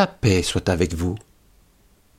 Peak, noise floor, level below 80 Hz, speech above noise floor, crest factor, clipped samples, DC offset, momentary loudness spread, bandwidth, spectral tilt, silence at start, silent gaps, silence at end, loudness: -4 dBFS; -57 dBFS; -40 dBFS; 36 dB; 18 dB; under 0.1%; under 0.1%; 9 LU; 16 kHz; -5.5 dB/octave; 0 s; none; 1 s; -22 LUFS